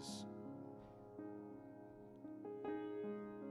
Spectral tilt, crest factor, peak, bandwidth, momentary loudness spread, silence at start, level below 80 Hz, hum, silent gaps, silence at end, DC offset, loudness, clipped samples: -5.5 dB/octave; 16 dB; -34 dBFS; 12.5 kHz; 11 LU; 0 s; -80 dBFS; none; none; 0 s; under 0.1%; -51 LUFS; under 0.1%